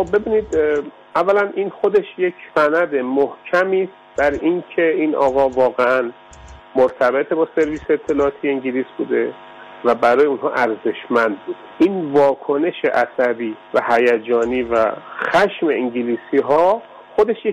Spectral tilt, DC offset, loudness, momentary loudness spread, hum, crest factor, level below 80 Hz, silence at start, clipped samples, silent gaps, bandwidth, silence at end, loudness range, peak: -6 dB/octave; under 0.1%; -18 LUFS; 7 LU; none; 12 dB; -50 dBFS; 0 s; under 0.1%; none; 10 kHz; 0 s; 2 LU; -6 dBFS